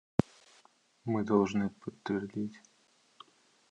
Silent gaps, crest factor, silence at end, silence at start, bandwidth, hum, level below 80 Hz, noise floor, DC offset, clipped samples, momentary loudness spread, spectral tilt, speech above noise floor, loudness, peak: none; 28 dB; 1.15 s; 1.05 s; 9.2 kHz; none; -64 dBFS; -68 dBFS; under 0.1%; under 0.1%; 14 LU; -7.5 dB/octave; 36 dB; -34 LUFS; -8 dBFS